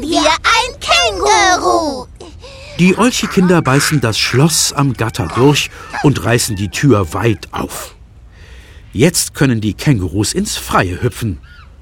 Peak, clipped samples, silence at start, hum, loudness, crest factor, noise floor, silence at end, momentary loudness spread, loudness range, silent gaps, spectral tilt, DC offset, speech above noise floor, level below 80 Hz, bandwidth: 0 dBFS; under 0.1%; 0 s; none; -13 LUFS; 14 dB; -38 dBFS; 0.2 s; 12 LU; 4 LU; none; -4.5 dB/octave; under 0.1%; 25 dB; -36 dBFS; 17.5 kHz